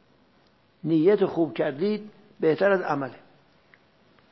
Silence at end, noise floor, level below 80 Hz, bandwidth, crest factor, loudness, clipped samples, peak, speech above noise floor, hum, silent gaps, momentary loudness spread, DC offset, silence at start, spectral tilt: 1.15 s; -62 dBFS; -72 dBFS; 6 kHz; 18 dB; -25 LUFS; under 0.1%; -8 dBFS; 38 dB; none; none; 11 LU; under 0.1%; 0.85 s; -8.5 dB/octave